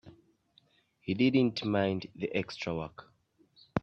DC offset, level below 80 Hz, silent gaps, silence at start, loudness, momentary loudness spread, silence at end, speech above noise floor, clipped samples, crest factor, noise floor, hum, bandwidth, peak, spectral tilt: under 0.1%; -66 dBFS; none; 0.05 s; -31 LUFS; 12 LU; 0.05 s; 37 dB; under 0.1%; 24 dB; -68 dBFS; none; 7.4 kHz; -10 dBFS; -7 dB/octave